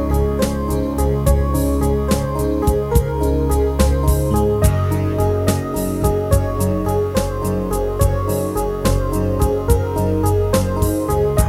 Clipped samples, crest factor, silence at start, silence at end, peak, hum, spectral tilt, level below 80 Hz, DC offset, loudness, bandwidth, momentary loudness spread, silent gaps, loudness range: under 0.1%; 16 dB; 0 s; 0 s; 0 dBFS; none; -6.5 dB/octave; -22 dBFS; 0.1%; -18 LUFS; 16.5 kHz; 4 LU; none; 2 LU